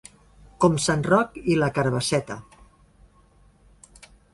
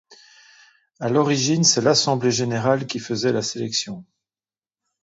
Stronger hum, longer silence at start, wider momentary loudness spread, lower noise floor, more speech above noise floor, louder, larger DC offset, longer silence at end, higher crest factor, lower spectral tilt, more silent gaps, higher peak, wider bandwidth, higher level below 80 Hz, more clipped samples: neither; first, 0.6 s vs 0.1 s; second, 7 LU vs 10 LU; second, -57 dBFS vs under -90 dBFS; second, 35 dB vs over 69 dB; about the same, -22 LUFS vs -20 LUFS; neither; first, 1.9 s vs 1 s; about the same, 20 dB vs 18 dB; about the same, -5 dB/octave vs -4 dB/octave; neither; about the same, -6 dBFS vs -4 dBFS; first, 11.5 kHz vs 8 kHz; first, -52 dBFS vs -64 dBFS; neither